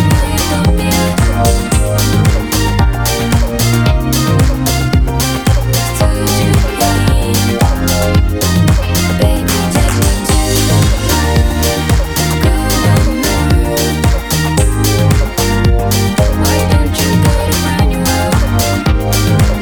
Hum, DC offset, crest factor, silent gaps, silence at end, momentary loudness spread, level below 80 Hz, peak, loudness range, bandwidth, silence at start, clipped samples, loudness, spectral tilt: none; under 0.1%; 10 dB; none; 0 s; 2 LU; -16 dBFS; 0 dBFS; 1 LU; over 20 kHz; 0 s; under 0.1%; -12 LUFS; -5 dB/octave